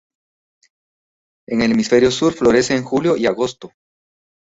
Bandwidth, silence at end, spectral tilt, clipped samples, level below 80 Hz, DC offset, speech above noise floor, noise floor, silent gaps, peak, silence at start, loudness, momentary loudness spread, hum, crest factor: 8 kHz; 0.85 s; -5 dB/octave; under 0.1%; -50 dBFS; under 0.1%; over 74 dB; under -90 dBFS; none; -2 dBFS; 1.5 s; -16 LUFS; 9 LU; none; 16 dB